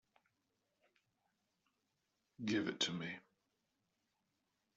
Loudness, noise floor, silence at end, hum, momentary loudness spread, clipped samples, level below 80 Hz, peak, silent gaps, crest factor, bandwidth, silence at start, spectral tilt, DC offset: -41 LUFS; -86 dBFS; 1.6 s; none; 10 LU; under 0.1%; -86 dBFS; -24 dBFS; none; 24 dB; 7.4 kHz; 2.4 s; -3 dB/octave; under 0.1%